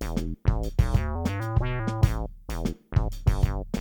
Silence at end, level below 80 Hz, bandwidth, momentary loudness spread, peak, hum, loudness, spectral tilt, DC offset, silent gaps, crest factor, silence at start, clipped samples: 0 s; -30 dBFS; 19.5 kHz; 7 LU; -6 dBFS; none; -28 LUFS; -7 dB/octave; under 0.1%; none; 18 dB; 0 s; under 0.1%